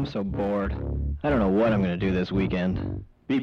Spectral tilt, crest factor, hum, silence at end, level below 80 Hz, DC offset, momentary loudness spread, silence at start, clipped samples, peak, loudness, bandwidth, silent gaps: -9 dB/octave; 10 dB; none; 0 s; -36 dBFS; under 0.1%; 8 LU; 0 s; under 0.1%; -14 dBFS; -26 LUFS; 6.4 kHz; none